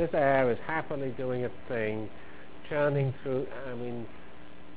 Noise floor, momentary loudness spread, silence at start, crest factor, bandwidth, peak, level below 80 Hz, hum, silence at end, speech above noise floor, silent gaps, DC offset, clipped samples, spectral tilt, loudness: -51 dBFS; 23 LU; 0 s; 20 dB; 4 kHz; -12 dBFS; -58 dBFS; none; 0 s; 20 dB; none; 1%; under 0.1%; -10.5 dB/octave; -31 LUFS